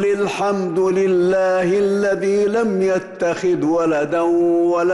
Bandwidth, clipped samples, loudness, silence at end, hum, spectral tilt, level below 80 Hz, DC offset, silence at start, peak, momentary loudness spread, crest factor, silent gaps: 12 kHz; under 0.1%; -18 LUFS; 0 s; none; -6.5 dB/octave; -56 dBFS; under 0.1%; 0 s; -10 dBFS; 4 LU; 6 dB; none